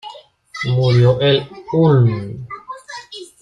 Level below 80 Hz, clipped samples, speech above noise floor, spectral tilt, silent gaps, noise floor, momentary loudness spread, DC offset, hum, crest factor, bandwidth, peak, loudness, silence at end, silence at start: -48 dBFS; under 0.1%; 24 dB; -7.5 dB/octave; none; -38 dBFS; 19 LU; under 0.1%; none; 14 dB; 9.8 kHz; -2 dBFS; -15 LUFS; 0.15 s; 0.05 s